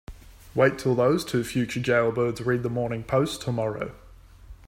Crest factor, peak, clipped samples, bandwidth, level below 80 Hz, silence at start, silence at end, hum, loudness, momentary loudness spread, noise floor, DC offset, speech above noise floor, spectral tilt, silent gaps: 20 dB; -6 dBFS; under 0.1%; 16 kHz; -50 dBFS; 0.1 s; 0.1 s; none; -25 LUFS; 7 LU; -49 dBFS; under 0.1%; 24 dB; -6 dB/octave; none